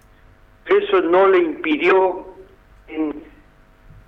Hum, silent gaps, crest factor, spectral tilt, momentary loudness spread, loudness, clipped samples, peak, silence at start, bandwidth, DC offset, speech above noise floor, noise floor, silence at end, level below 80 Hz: none; none; 16 dB; -6.5 dB/octave; 19 LU; -17 LUFS; under 0.1%; -4 dBFS; 0.65 s; 5.6 kHz; under 0.1%; 33 dB; -50 dBFS; 0.85 s; -52 dBFS